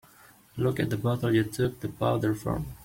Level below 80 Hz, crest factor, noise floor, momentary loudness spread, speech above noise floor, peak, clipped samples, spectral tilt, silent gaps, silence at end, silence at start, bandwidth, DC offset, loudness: -50 dBFS; 18 dB; -56 dBFS; 5 LU; 28 dB; -10 dBFS; under 0.1%; -7 dB/octave; none; 0 s; 0.55 s; 16.5 kHz; under 0.1%; -28 LUFS